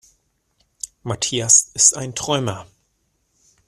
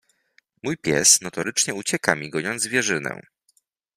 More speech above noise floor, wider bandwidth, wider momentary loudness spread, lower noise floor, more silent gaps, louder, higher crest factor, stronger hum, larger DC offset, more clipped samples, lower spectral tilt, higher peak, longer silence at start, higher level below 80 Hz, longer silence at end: first, 49 dB vs 43 dB; about the same, 15 kHz vs 15.5 kHz; first, 21 LU vs 16 LU; about the same, -68 dBFS vs -66 dBFS; neither; first, -16 LUFS vs -21 LUFS; about the same, 22 dB vs 24 dB; neither; neither; neither; about the same, -2 dB/octave vs -1.5 dB/octave; about the same, 0 dBFS vs 0 dBFS; first, 0.85 s vs 0.65 s; about the same, -56 dBFS vs -60 dBFS; first, 1.05 s vs 0.75 s